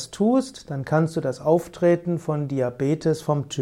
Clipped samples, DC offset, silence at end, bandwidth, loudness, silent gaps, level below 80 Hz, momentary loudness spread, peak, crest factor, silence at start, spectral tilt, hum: under 0.1%; under 0.1%; 0 s; 14.5 kHz; -23 LUFS; none; -58 dBFS; 5 LU; -6 dBFS; 16 dB; 0 s; -7 dB/octave; none